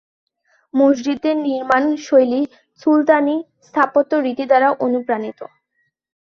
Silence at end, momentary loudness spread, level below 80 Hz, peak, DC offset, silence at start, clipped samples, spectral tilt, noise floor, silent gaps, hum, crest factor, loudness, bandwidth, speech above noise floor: 0.85 s; 10 LU; -66 dBFS; 0 dBFS; under 0.1%; 0.75 s; under 0.1%; -5 dB/octave; -69 dBFS; none; none; 16 dB; -17 LUFS; 7 kHz; 53 dB